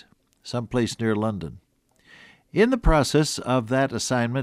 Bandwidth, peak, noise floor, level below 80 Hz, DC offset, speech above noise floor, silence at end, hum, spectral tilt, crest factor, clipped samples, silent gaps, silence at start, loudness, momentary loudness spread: 15 kHz; -4 dBFS; -57 dBFS; -34 dBFS; under 0.1%; 35 dB; 0 s; none; -5 dB/octave; 20 dB; under 0.1%; none; 0.45 s; -23 LUFS; 12 LU